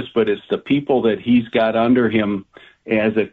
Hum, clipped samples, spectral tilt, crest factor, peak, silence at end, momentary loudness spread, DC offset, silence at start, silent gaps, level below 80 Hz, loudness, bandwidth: none; under 0.1%; -9 dB/octave; 12 dB; -6 dBFS; 0.05 s; 7 LU; under 0.1%; 0 s; none; -54 dBFS; -18 LUFS; 4.4 kHz